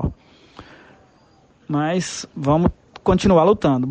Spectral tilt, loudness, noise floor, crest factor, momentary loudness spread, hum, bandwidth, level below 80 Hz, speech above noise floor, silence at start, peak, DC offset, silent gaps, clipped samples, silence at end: -6.5 dB/octave; -19 LUFS; -54 dBFS; 16 dB; 11 LU; none; 9.4 kHz; -38 dBFS; 37 dB; 0 s; -4 dBFS; under 0.1%; none; under 0.1%; 0 s